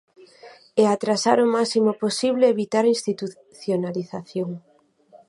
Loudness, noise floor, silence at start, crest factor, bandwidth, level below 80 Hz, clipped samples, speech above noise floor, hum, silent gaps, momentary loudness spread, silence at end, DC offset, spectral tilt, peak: -22 LUFS; -54 dBFS; 0.45 s; 20 dB; 11.5 kHz; -74 dBFS; under 0.1%; 33 dB; none; none; 12 LU; 0.7 s; under 0.1%; -5 dB/octave; -4 dBFS